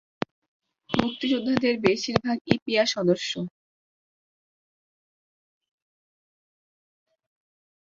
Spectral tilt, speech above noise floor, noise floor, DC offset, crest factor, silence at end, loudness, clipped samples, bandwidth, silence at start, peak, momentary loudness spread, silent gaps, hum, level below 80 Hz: -5 dB/octave; over 66 dB; under -90 dBFS; under 0.1%; 28 dB; 4.45 s; -25 LUFS; under 0.1%; 7.8 kHz; 0.9 s; -2 dBFS; 13 LU; 2.41-2.45 s, 2.62-2.66 s; none; -60 dBFS